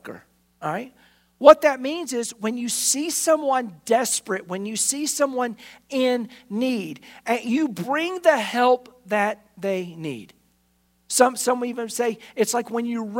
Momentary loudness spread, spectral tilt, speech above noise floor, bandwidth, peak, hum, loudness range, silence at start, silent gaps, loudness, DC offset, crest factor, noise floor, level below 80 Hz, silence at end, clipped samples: 12 LU; -3 dB/octave; 43 dB; 16.5 kHz; 0 dBFS; 60 Hz at -60 dBFS; 5 LU; 0.05 s; none; -22 LUFS; under 0.1%; 24 dB; -65 dBFS; -66 dBFS; 0 s; under 0.1%